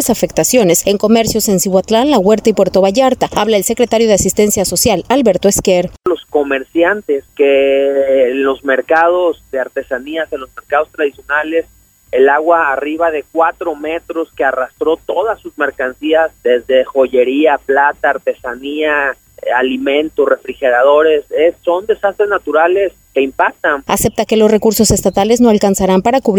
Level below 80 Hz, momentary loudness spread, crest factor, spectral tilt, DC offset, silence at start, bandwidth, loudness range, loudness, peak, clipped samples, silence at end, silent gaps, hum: -40 dBFS; 9 LU; 12 dB; -4 dB/octave; under 0.1%; 0 s; over 20 kHz; 4 LU; -13 LUFS; 0 dBFS; under 0.1%; 0 s; none; none